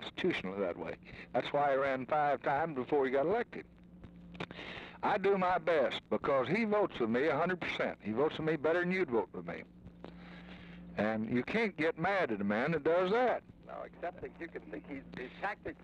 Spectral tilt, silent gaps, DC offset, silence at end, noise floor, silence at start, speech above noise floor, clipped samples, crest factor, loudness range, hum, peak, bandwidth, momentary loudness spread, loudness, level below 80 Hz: -7 dB/octave; none; under 0.1%; 0 s; -54 dBFS; 0 s; 20 dB; under 0.1%; 14 dB; 4 LU; none; -20 dBFS; 9.2 kHz; 16 LU; -34 LUFS; -64 dBFS